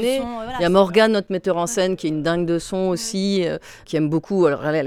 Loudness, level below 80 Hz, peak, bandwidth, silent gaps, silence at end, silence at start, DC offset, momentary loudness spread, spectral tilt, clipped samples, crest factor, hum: -20 LUFS; -50 dBFS; -4 dBFS; 15.5 kHz; none; 0 s; 0 s; under 0.1%; 8 LU; -5 dB/octave; under 0.1%; 16 dB; none